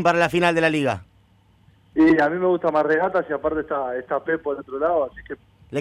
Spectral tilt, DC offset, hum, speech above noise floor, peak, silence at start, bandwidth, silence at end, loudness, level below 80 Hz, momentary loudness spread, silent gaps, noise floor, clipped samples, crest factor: -6 dB/octave; under 0.1%; none; 36 dB; -6 dBFS; 0 s; 11.5 kHz; 0 s; -21 LUFS; -52 dBFS; 12 LU; none; -57 dBFS; under 0.1%; 16 dB